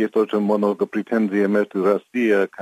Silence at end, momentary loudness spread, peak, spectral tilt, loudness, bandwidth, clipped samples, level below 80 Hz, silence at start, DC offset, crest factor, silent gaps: 0 s; 3 LU; -6 dBFS; -7.5 dB/octave; -20 LUFS; 14 kHz; under 0.1%; -74 dBFS; 0 s; under 0.1%; 14 dB; none